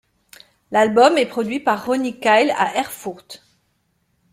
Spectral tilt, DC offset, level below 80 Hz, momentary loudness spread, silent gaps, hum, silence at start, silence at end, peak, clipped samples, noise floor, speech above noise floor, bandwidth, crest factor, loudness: -4 dB/octave; under 0.1%; -64 dBFS; 15 LU; none; none; 0.7 s; 0.95 s; -2 dBFS; under 0.1%; -67 dBFS; 49 dB; 16.5 kHz; 18 dB; -18 LUFS